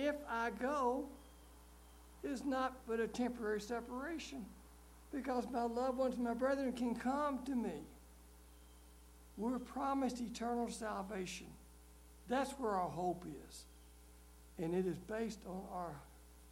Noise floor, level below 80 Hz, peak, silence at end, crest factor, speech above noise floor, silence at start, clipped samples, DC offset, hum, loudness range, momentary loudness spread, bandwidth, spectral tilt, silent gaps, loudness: -61 dBFS; -62 dBFS; -24 dBFS; 0 s; 18 dB; 20 dB; 0 s; under 0.1%; under 0.1%; none; 4 LU; 23 LU; 16.5 kHz; -5.5 dB/octave; none; -41 LUFS